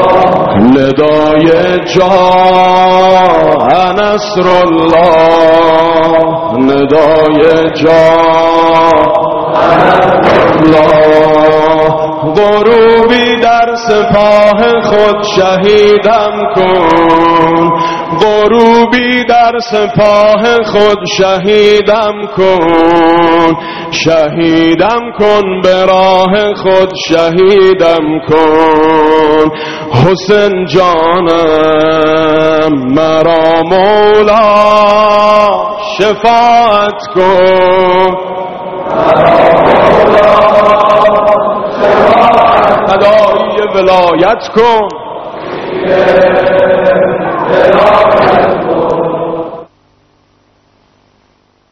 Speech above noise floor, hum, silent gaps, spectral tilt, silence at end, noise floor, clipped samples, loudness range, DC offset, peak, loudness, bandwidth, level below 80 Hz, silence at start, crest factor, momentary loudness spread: 45 dB; none; none; -6 dB/octave; 2.05 s; -51 dBFS; 2%; 2 LU; 1%; 0 dBFS; -7 LUFS; 7.8 kHz; -36 dBFS; 0 s; 6 dB; 6 LU